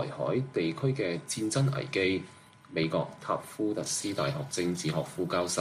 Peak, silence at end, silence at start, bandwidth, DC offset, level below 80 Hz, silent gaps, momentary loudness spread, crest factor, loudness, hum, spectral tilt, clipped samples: -14 dBFS; 0 s; 0 s; 15 kHz; under 0.1%; -66 dBFS; none; 5 LU; 18 dB; -31 LUFS; none; -5 dB/octave; under 0.1%